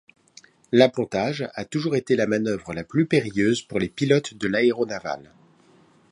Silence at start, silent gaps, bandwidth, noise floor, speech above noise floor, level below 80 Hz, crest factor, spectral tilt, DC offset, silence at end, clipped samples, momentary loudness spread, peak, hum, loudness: 0.7 s; none; 11 kHz; -56 dBFS; 34 dB; -58 dBFS; 22 dB; -6 dB/octave; under 0.1%; 0.95 s; under 0.1%; 10 LU; -2 dBFS; none; -23 LUFS